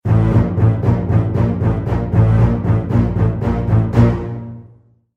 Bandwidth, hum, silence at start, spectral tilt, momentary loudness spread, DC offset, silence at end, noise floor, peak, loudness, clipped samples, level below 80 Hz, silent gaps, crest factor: 4.2 kHz; none; 0.05 s; -10.5 dB/octave; 6 LU; under 0.1%; 0.5 s; -48 dBFS; 0 dBFS; -16 LUFS; under 0.1%; -26 dBFS; none; 14 dB